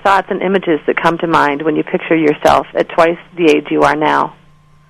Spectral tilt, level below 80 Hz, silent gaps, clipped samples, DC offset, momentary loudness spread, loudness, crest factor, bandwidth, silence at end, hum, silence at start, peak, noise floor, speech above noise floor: -5.5 dB/octave; -46 dBFS; none; 0.1%; under 0.1%; 5 LU; -13 LUFS; 14 dB; 13 kHz; 0.55 s; none; 0.05 s; 0 dBFS; -46 dBFS; 33 dB